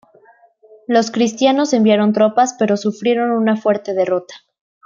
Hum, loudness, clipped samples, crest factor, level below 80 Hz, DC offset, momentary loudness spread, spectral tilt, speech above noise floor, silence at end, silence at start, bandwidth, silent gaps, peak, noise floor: none; -16 LUFS; under 0.1%; 14 dB; -66 dBFS; under 0.1%; 5 LU; -5 dB/octave; 35 dB; 0.5 s; 0.9 s; 7.6 kHz; none; -2 dBFS; -50 dBFS